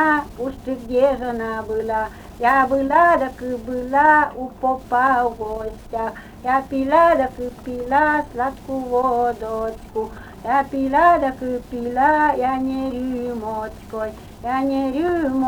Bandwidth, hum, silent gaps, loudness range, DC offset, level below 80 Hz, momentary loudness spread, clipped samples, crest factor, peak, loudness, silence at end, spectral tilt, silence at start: over 20 kHz; none; none; 4 LU; under 0.1%; -44 dBFS; 14 LU; under 0.1%; 16 dB; -4 dBFS; -20 LUFS; 0 s; -6 dB/octave; 0 s